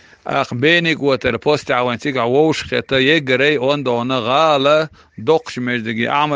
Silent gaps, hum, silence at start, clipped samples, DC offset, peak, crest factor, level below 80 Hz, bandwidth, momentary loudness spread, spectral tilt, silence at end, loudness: none; none; 0.25 s; under 0.1%; under 0.1%; 0 dBFS; 16 dB; -52 dBFS; 9.6 kHz; 7 LU; -5.5 dB/octave; 0 s; -16 LUFS